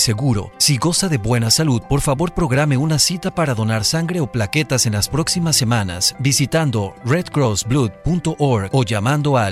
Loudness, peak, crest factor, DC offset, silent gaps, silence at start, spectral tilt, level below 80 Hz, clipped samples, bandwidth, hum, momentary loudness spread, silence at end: -17 LUFS; -2 dBFS; 14 dB; under 0.1%; none; 0 s; -4.5 dB/octave; -38 dBFS; under 0.1%; 16 kHz; none; 5 LU; 0 s